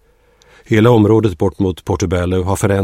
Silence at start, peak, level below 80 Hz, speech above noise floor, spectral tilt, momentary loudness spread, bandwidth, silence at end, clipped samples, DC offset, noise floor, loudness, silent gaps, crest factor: 0.7 s; 0 dBFS; -36 dBFS; 38 dB; -7 dB/octave; 8 LU; 15.5 kHz; 0 s; under 0.1%; under 0.1%; -51 dBFS; -14 LUFS; none; 14 dB